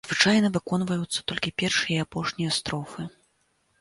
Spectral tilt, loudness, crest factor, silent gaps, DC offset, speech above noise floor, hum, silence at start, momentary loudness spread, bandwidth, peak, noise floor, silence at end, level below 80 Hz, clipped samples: -4 dB/octave; -25 LUFS; 22 dB; none; under 0.1%; 44 dB; none; 0.05 s; 13 LU; 11.5 kHz; -6 dBFS; -69 dBFS; 0.7 s; -58 dBFS; under 0.1%